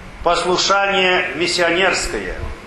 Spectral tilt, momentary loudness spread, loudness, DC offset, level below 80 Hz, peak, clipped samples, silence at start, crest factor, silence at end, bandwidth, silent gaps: -2.5 dB/octave; 8 LU; -16 LUFS; under 0.1%; -36 dBFS; 0 dBFS; under 0.1%; 0 s; 18 dB; 0 s; 12.5 kHz; none